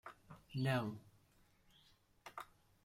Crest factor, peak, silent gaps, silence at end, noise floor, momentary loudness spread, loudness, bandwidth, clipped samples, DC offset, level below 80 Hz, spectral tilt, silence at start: 20 dB; -26 dBFS; none; 0.4 s; -72 dBFS; 21 LU; -43 LUFS; 16 kHz; under 0.1%; under 0.1%; -74 dBFS; -6.5 dB/octave; 0.05 s